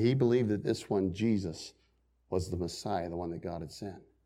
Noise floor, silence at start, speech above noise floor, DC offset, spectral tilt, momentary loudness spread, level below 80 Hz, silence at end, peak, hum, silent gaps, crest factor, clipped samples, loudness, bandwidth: -71 dBFS; 0 s; 39 dB; under 0.1%; -7 dB/octave; 16 LU; -58 dBFS; 0.25 s; -16 dBFS; none; none; 18 dB; under 0.1%; -33 LUFS; 13.5 kHz